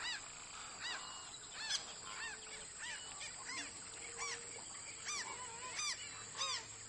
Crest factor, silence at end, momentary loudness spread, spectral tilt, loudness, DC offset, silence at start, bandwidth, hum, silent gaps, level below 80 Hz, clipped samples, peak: 22 dB; 0 s; 8 LU; 0.5 dB/octave; -44 LUFS; under 0.1%; 0 s; 11.5 kHz; none; none; -74 dBFS; under 0.1%; -24 dBFS